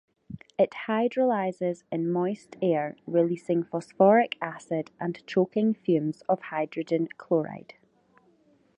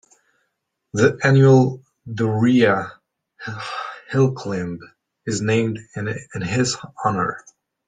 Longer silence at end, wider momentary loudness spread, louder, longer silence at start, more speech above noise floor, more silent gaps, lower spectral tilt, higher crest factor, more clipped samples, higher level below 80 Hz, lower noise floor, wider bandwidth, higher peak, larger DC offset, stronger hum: first, 1.2 s vs 0.5 s; second, 11 LU vs 19 LU; second, -27 LUFS vs -20 LUFS; second, 0.3 s vs 0.95 s; second, 37 dB vs 56 dB; neither; first, -7.5 dB/octave vs -6 dB/octave; about the same, 20 dB vs 20 dB; neither; second, -72 dBFS vs -58 dBFS; second, -63 dBFS vs -74 dBFS; about the same, 9.8 kHz vs 9.4 kHz; second, -8 dBFS vs -2 dBFS; neither; neither